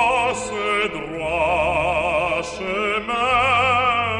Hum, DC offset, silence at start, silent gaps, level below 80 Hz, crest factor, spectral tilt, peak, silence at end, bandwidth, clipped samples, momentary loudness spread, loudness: none; under 0.1%; 0 s; none; -42 dBFS; 14 dB; -3.5 dB/octave; -6 dBFS; 0 s; 11 kHz; under 0.1%; 8 LU; -20 LUFS